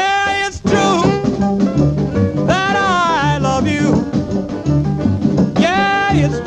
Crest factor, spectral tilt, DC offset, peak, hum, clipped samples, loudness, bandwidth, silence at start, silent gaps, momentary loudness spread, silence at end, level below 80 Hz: 14 dB; -6 dB/octave; under 0.1%; 0 dBFS; none; under 0.1%; -15 LUFS; 9.8 kHz; 0 s; none; 3 LU; 0 s; -34 dBFS